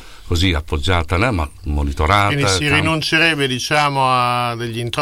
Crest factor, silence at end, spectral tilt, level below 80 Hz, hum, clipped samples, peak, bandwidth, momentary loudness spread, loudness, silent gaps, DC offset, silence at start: 14 dB; 0 s; -4.5 dB/octave; -28 dBFS; none; under 0.1%; -2 dBFS; 16.5 kHz; 8 LU; -17 LUFS; none; under 0.1%; 0 s